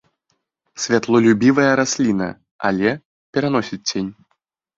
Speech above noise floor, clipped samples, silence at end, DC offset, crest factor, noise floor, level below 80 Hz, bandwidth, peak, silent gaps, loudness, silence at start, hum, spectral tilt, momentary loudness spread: 54 dB; under 0.1%; 0.65 s; under 0.1%; 18 dB; -71 dBFS; -56 dBFS; 7.8 kHz; -2 dBFS; 2.51-2.59 s, 3.05-3.33 s; -18 LUFS; 0.75 s; none; -4.5 dB/octave; 13 LU